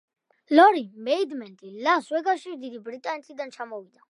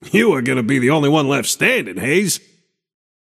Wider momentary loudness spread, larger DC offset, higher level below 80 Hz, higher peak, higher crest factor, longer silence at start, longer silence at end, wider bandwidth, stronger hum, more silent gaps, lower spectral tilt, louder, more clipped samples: first, 20 LU vs 4 LU; neither; second, -88 dBFS vs -62 dBFS; second, -4 dBFS vs 0 dBFS; first, 22 dB vs 16 dB; first, 0.5 s vs 0 s; second, 0.25 s vs 1 s; second, 11.5 kHz vs 15.5 kHz; neither; neither; about the same, -4 dB/octave vs -4.5 dB/octave; second, -23 LUFS vs -16 LUFS; neither